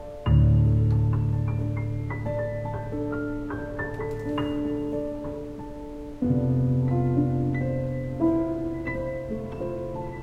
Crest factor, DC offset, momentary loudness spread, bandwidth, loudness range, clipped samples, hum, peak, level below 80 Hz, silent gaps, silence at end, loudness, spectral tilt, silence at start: 16 dB; under 0.1%; 11 LU; 5.2 kHz; 5 LU; under 0.1%; none; -10 dBFS; -36 dBFS; none; 0 s; -27 LUFS; -10 dB/octave; 0 s